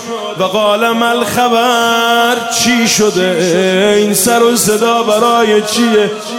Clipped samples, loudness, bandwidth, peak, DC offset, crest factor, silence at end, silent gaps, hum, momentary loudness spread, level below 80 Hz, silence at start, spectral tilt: under 0.1%; -10 LUFS; 17.5 kHz; 0 dBFS; under 0.1%; 10 dB; 0 s; none; none; 3 LU; -52 dBFS; 0 s; -3 dB/octave